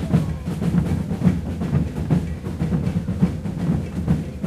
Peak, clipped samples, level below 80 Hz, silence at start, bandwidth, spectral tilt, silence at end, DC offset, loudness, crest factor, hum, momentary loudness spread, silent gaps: -4 dBFS; under 0.1%; -34 dBFS; 0 s; 13 kHz; -8.5 dB/octave; 0 s; under 0.1%; -23 LUFS; 18 dB; none; 4 LU; none